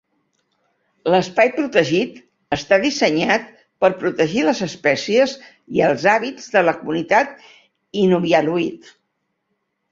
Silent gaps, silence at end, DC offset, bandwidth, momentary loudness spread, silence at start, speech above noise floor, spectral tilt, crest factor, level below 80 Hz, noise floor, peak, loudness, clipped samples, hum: none; 1.15 s; under 0.1%; 7.6 kHz; 9 LU; 1.05 s; 55 dB; -5 dB/octave; 18 dB; -58 dBFS; -73 dBFS; -2 dBFS; -18 LUFS; under 0.1%; none